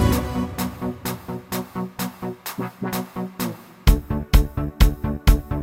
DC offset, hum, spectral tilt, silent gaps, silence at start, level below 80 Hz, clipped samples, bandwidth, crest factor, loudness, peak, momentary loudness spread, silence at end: under 0.1%; none; -6 dB/octave; none; 0 s; -24 dBFS; under 0.1%; 17 kHz; 20 dB; -24 LUFS; -2 dBFS; 10 LU; 0 s